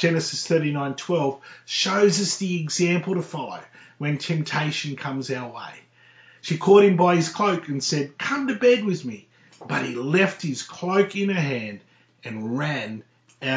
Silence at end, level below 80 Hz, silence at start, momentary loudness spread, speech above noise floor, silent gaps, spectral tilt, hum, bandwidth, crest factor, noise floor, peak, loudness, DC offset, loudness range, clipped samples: 0 s; -74 dBFS; 0 s; 17 LU; 30 dB; none; -5 dB/octave; none; 8 kHz; 20 dB; -53 dBFS; -4 dBFS; -23 LUFS; under 0.1%; 6 LU; under 0.1%